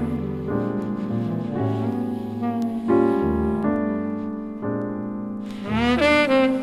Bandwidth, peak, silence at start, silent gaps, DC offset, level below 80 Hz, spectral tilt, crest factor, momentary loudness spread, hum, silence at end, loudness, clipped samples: 12 kHz; -4 dBFS; 0 s; none; under 0.1%; -44 dBFS; -7 dB/octave; 18 dB; 12 LU; none; 0 s; -23 LUFS; under 0.1%